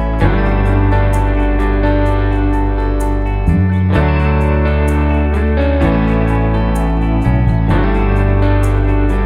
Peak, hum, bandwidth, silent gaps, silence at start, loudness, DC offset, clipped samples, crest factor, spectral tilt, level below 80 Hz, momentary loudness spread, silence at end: 0 dBFS; none; 11 kHz; none; 0 s; -14 LUFS; under 0.1%; under 0.1%; 12 dB; -8.5 dB/octave; -16 dBFS; 3 LU; 0 s